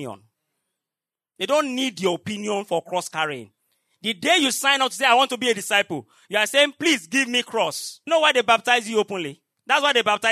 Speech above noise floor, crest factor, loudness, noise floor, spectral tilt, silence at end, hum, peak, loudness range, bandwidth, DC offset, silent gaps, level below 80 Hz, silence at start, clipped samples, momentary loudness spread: 68 dB; 20 dB; -21 LUFS; -90 dBFS; -2 dB/octave; 0 s; none; -2 dBFS; 6 LU; 13.5 kHz; under 0.1%; none; -78 dBFS; 0 s; under 0.1%; 11 LU